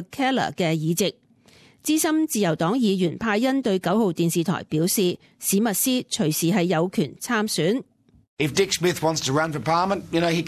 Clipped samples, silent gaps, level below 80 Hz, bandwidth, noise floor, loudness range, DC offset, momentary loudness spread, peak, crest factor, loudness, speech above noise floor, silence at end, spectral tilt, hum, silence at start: under 0.1%; 8.28-8.37 s; -58 dBFS; 14.5 kHz; -54 dBFS; 1 LU; under 0.1%; 4 LU; -8 dBFS; 16 dB; -23 LUFS; 32 dB; 0 s; -4.5 dB/octave; none; 0 s